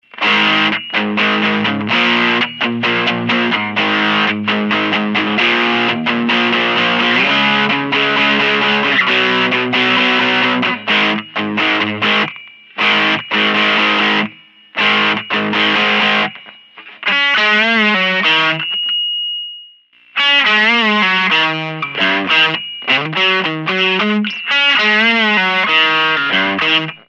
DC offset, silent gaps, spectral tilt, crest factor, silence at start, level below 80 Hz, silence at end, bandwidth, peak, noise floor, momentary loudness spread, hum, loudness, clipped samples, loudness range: under 0.1%; none; -4.5 dB/octave; 14 dB; 0.15 s; -68 dBFS; 0.15 s; 8 kHz; -2 dBFS; -46 dBFS; 6 LU; none; -13 LUFS; under 0.1%; 2 LU